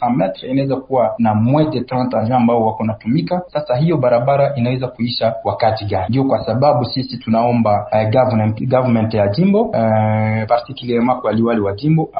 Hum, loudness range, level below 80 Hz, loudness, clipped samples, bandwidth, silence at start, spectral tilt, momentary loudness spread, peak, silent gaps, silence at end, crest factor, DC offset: none; 2 LU; -46 dBFS; -16 LUFS; under 0.1%; 5.2 kHz; 0 s; -13 dB/octave; 5 LU; 0 dBFS; none; 0 s; 14 dB; under 0.1%